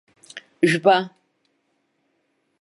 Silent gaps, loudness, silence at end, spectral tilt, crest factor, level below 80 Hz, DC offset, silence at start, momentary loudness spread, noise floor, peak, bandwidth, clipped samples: none; -19 LUFS; 1.55 s; -5.5 dB/octave; 22 dB; -76 dBFS; under 0.1%; 0.35 s; 24 LU; -70 dBFS; -2 dBFS; 11.5 kHz; under 0.1%